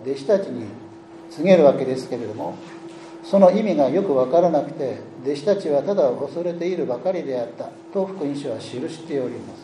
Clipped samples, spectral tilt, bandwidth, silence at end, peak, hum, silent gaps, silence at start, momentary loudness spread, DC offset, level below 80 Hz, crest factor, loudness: under 0.1%; -7 dB/octave; 10.5 kHz; 0 s; 0 dBFS; none; none; 0 s; 21 LU; under 0.1%; -70 dBFS; 20 dB; -21 LUFS